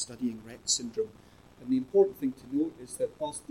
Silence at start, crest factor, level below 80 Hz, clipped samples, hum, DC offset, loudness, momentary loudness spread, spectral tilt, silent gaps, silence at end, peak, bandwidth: 0 s; 20 dB; -64 dBFS; under 0.1%; none; under 0.1%; -31 LUFS; 12 LU; -3.5 dB/octave; none; 0.1 s; -12 dBFS; 14 kHz